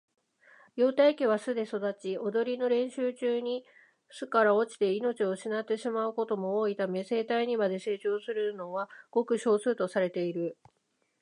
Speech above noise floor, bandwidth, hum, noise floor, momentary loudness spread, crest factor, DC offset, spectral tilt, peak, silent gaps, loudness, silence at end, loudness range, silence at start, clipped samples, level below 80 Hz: 31 dB; 11 kHz; none; -60 dBFS; 10 LU; 18 dB; under 0.1%; -5.5 dB/octave; -12 dBFS; none; -30 LUFS; 0.7 s; 2 LU; 0.75 s; under 0.1%; -86 dBFS